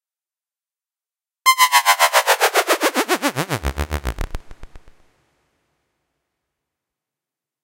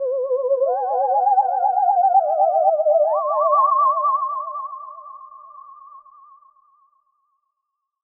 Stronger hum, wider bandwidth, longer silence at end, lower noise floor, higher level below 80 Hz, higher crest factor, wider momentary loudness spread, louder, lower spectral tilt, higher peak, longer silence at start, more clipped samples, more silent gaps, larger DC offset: neither; first, 17 kHz vs 1.9 kHz; first, 2.85 s vs 2.05 s; first, under -90 dBFS vs -79 dBFS; first, -36 dBFS vs -86 dBFS; first, 22 dB vs 14 dB; about the same, 15 LU vs 16 LU; about the same, -17 LUFS vs -18 LUFS; second, -2 dB/octave vs -3.5 dB/octave; first, 0 dBFS vs -6 dBFS; first, 1.45 s vs 0 s; neither; neither; neither